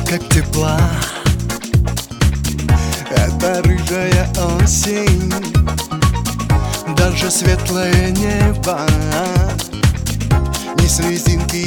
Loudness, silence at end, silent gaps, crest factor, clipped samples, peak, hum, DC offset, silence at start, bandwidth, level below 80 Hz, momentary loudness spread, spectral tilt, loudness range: -16 LUFS; 0 s; none; 14 dB; under 0.1%; -2 dBFS; none; under 0.1%; 0 s; 19 kHz; -20 dBFS; 4 LU; -5 dB/octave; 1 LU